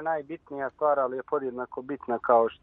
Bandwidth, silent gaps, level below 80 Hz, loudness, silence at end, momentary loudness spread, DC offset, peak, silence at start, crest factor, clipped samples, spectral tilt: 3.9 kHz; none; -68 dBFS; -28 LUFS; 0.1 s; 13 LU; under 0.1%; -8 dBFS; 0 s; 20 dB; under 0.1%; -9 dB/octave